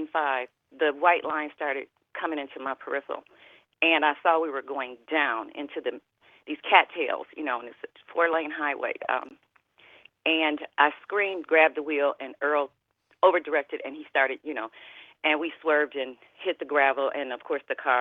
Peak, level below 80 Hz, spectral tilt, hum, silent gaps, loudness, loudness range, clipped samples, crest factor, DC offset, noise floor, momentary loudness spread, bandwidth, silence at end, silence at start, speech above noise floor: -2 dBFS; -80 dBFS; -5 dB/octave; none; none; -26 LUFS; 3 LU; under 0.1%; 24 dB; under 0.1%; -59 dBFS; 14 LU; 4.3 kHz; 0 s; 0 s; 32 dB